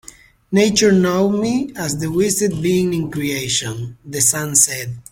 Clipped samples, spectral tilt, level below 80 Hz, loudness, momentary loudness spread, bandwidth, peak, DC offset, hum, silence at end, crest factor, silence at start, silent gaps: under 0.1%; -4 dB/octave; -48 dBFS; -17 LUFS; 9 LU; 16.5 kHz; 0 dBFS; under 0.1%; none; 0.1 s; 18 dB; 0.5 s; none